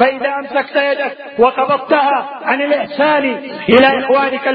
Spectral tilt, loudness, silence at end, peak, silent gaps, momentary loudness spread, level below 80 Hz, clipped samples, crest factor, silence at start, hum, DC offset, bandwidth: -7.5 dB/octave; -14 LUFS; 0 s; 0 dBFS; none; 9 LU; -54 dBFS; under 0.1%; 14 dB; 0 s; none; under 0.1%; 5.2 kHz